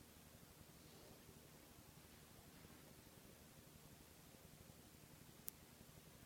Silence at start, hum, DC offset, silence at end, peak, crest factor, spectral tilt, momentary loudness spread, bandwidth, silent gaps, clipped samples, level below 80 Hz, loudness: 0 s; none; under 0.1%; 0 s; -20 dBFS; 42 dB; -3.5 dB/octave; 8 LU; 17.5 kHz; none; under 0.1%; -74 dBFS; -62 LUFS